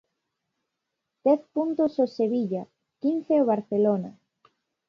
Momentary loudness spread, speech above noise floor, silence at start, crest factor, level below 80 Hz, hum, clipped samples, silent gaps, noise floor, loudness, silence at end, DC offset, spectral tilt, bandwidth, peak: 7 LU; 59 dB; 1.25 s; 18 dB; -76 dBFS; none; under 0.1%; none; -83 dBFS; -25 LUFS; 0.8 s; under 0.1%; -9.5 dB/octave; 6.8 kHz; -10 dBFS